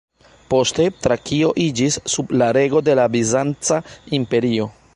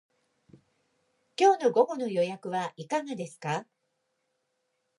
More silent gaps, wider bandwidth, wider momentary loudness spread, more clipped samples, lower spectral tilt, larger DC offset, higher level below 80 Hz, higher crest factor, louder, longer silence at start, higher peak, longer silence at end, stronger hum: neither; about the same, 11.5 kHz vs 11.5 kHz; second, 5 LU vs 13 LU; neither; about the same, -4.5 dB/octave vs -5 dB/octave; neither; first, -50 dBFS vs -84 dBFS; second, 14 dB vs 22 dB; first, -18 LUFS vs -28 LUFS; second, 0.5 s vs 1.4 s; first, -4 dBFS vs -10 dBFS; second, 0.25 s vs 1.35 s; neither